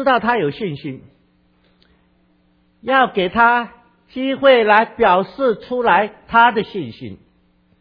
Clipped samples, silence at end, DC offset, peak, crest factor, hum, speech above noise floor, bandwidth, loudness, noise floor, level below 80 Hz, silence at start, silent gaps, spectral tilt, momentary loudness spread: under 0.1%; 0.65 s; under 0.1%; 0 dBFS; 18 dB; none; 42 dB; 5.2 kHz; -16 LUFS; -58 dBFS; -52 dBFS; 0 s; none; -8 dB/octave; 19 LU